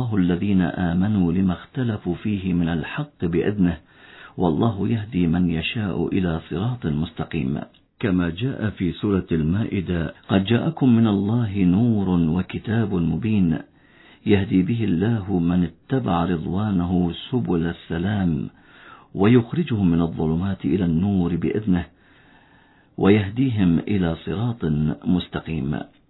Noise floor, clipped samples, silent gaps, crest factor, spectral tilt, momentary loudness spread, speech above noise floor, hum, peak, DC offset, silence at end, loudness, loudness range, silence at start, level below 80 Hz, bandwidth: -54 dBFS; under 0.1%; none; 18 dB; -11.5 dB/octave; 8 LU; 34 dB; none; -2 dBFS; under 0.1%; 0.25 s; -22 LUFS; 4 LU; 0 s; -44 dBFS; 4.1 kHz